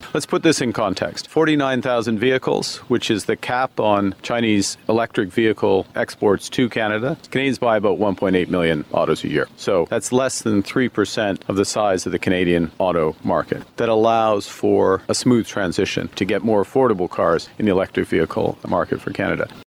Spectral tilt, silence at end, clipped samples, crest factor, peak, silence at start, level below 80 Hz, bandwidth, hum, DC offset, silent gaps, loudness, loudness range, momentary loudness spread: -5 dB/octave; 0.05 s; under 0.1%; 16 dB; -4 dBFS; 0 s; -52 dBFS; 16 kHz; none; under 0.1%; none; -20 LUFS; 1 LU; 5 LU